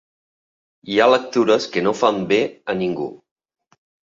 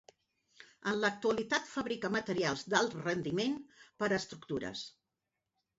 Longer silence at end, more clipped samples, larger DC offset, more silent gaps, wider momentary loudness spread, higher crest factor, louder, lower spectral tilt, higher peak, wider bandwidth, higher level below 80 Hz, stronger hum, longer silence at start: about the same, 0.95 s vs 0.9 s; neither; neither; neither; about the same, 9 LU vs 9 LU; about the same, 18 dB vs 22 dB; first, -19 LUFS vs -35 LUFS; first, -5 dB/octave vs -3 dB/octave; first, -2 dBFS vs -14 dBFS; about the same, 7.6 kHz vs 7.6 kHz; first, -62 dBFS vs -70 dBFS; neither; first, 0.85 s vs 0.6 s